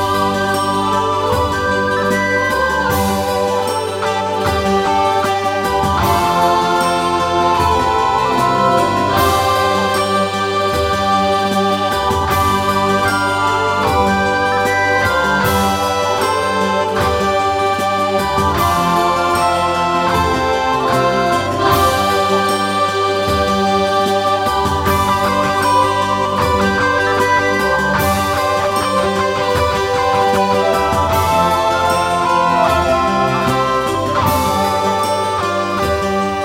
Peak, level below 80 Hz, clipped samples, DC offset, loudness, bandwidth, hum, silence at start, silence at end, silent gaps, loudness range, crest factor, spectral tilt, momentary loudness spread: -2 dBFS; -34 dBFS; under 0.1%; under 0.1%; -15 LUFS; 17.5 kHz; none; 0 s; 0 s; none; 2 LU; 14 dB; -4.5 dB/octave; 3 LU